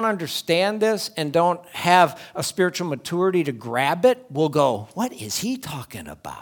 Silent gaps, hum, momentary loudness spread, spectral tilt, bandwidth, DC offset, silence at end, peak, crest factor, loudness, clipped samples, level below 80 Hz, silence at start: none; none; 10 LU; -4.5 dB/octave; over 20 kHz; under 0.1%; 0 s; 0 dBFS; 22 dB; -22 LUFS; under 0.1%; -62 dBFS; 0 s